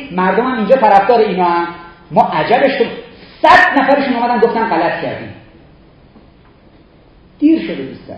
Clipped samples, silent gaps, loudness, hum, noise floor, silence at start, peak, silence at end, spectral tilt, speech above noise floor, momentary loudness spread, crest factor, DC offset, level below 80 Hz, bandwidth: 0.3%; none; -12 LUFS; none; -45 dBFS; 0 s; 0 dBFS; 0 s; -6.5 dB/octave; 33 dB; 15 LU; 14 dB; under 0.1%; -48 dBFS; 9.6 kHz